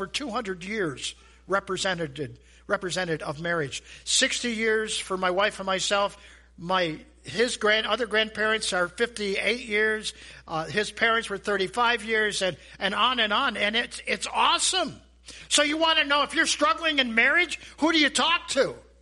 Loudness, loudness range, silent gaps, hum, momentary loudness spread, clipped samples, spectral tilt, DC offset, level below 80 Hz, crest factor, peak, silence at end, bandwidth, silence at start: -25 LUFS; 5 LU; none; none; 10 LU; under 0.1%; -2 dB/octave; under 0.1%; -56 dBFS; 20 dB; -6 dBFS; 0.2 s; 11.5 kHz; 0 s